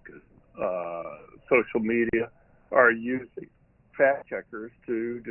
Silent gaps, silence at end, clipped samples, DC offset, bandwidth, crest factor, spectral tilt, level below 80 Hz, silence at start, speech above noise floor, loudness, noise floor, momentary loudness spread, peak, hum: none; 0 s; under 0.1%; under 0.1%; 3.2 kHz; 22 dB; -10 dB/octave; -60 dBFS; 0.05 s; 26 dB; -26 LUFS; -51 dBFS; 20 LU; -6 dBFS; none